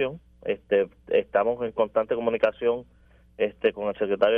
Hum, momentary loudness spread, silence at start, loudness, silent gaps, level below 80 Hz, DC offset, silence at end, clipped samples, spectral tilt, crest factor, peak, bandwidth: none; 7 LU; 0 s; -26 LUFS; none; -58 dBFS; under 0.1%; 0 s; under 0.1%; -7.5 dB/octave; 20 dB; -6 dBFS; 5 kHz